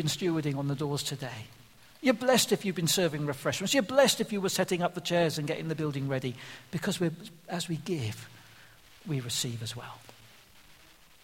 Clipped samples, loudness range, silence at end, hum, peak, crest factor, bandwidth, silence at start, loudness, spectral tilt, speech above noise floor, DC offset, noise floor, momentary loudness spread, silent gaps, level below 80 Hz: under 0.1%; 9 LU; 1.1 s; none; -8 dBFS; 22 dB; 16.5 kHz; 0 s; -30 LUFS; -4 dB/octave; 28 dB; under 0.1%; -58 dBFS; 17 LU; none; -66 dBFS